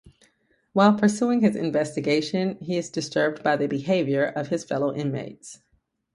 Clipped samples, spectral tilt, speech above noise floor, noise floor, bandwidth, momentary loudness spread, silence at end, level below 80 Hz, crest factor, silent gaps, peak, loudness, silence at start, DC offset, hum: under 0.1%; -6 dB/octave; 46 dB; -69 dBFS; 11.5 kHz; 9 LU; 0.6 s; -66 dBFS; 20 dB; none; -4 dBFS; -24 LUFS; 0.05 s; under 0.1%; none